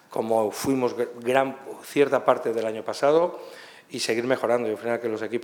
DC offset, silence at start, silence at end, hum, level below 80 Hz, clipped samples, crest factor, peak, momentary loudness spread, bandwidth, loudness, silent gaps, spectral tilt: under 0.1%; 0.1 s; 0 s; none; -68 dBFS; under 0.1%; 22 dB; -4 dBFS; 9 LU; 19 kHz; -25 LUFS; none; -4.5 dB/octave